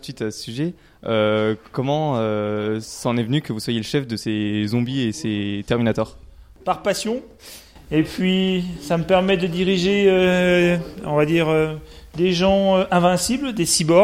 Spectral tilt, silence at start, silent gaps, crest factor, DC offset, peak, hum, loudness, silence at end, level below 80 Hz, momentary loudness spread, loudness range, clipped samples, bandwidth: -5 dB/octave; 0.05 s; none; 18 dB; under 0.1%; -2 dBFS; none; -20 LUFS; 0 s; -46 dBFS; 11 LU; 5 LU; under 0.1%; 16 kHz